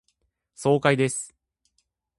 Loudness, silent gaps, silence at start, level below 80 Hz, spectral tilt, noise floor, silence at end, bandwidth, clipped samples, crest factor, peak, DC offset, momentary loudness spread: -23 LUFS; none; 0.6 s; -66 dBFS; -5 dB/octave; -74 dBFS; 0.9 s; 11.5 kHz; under 0.1%; 22 dB; -6 dBFS; under 0.1%; 13 LU